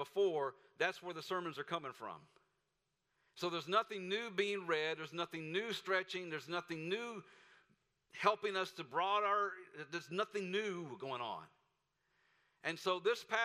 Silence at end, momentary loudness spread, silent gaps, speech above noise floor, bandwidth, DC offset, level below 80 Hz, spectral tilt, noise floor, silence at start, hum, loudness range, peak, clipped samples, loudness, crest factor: 0 s; 11 LU; none; 46 dB; 15.5 kHz; under 0.1%; -88 dBFS; -4 dB/octave; -86 dBFS; 0 s; none; 4 LU; -16 dBFS; under 0.1%; -39 LUFS; 24 dB